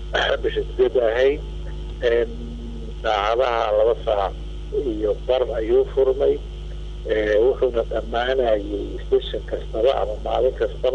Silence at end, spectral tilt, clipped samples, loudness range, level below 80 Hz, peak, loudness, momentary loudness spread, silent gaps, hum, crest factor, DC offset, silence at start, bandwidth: 0 s; -6.5 dB/octave; under 0.1%; 2 LU; -32 dBFS; -8 dBFS; -21 LUFS; 14 LU; none; 50 Hz at -45 dBFS; 14 dB; under 0.1%; 0 s; 8.2 kHz